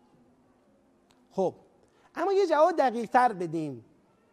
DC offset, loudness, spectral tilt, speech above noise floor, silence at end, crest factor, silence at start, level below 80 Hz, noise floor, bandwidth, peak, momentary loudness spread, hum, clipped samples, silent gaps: under 0.1%; -27 LUFS; -6 dB/octave; 39 dB; 0.5 s; 20 dB; 1.35 s; -76 dBFS; -64 dBFS; 12 kHz; -8 dBFS; 16 LU; none; under 0.1%; none